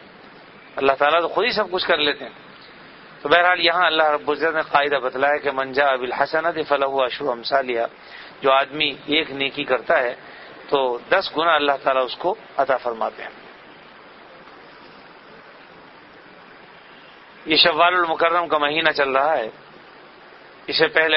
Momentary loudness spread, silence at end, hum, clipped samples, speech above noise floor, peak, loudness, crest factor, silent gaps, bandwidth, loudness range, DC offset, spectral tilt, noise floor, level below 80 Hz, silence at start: 12 LU; 0 s; none; under 0.1%; 25 dB; 0 dBFS; -19 LUFS; 22 dB; none; 6 kHz; 5 LU; under 0.1%; -6 dB/octave; -45 dBFS; -60 dBFS; 0 s